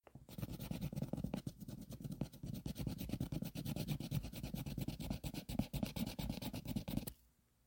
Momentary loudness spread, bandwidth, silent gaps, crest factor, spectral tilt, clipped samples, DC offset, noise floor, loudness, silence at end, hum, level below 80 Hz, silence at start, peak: 7 LU; 17 kHz; none; 22 dB; -6 dB/octave; under 0.1%; under 0.1%; -73 dBFS; -45 LUFS; 0.5 s; none; -54 dBFS; 0.15 s; -22 dBFS